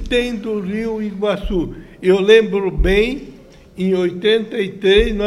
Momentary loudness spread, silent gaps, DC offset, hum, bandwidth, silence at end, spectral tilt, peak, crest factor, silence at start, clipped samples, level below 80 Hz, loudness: 11 LU; none; under 0.1%; none; 12.5 kHz; 0 s; -6 dB/octave; 0 dBFS; 16 dB; 0 s; under 0.1%; -28 dBFS; -17 LUFS